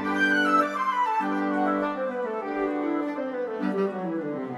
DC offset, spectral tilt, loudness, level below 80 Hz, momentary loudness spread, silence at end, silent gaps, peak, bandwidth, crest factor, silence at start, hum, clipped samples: under 0.1%; -6 dB/octave; -26 LUFS; -66 dBFS; 8 LU; 0 s; none; -10 dBFS; 12.5 kHz; 16 dB; 0 s; none; under 0.1%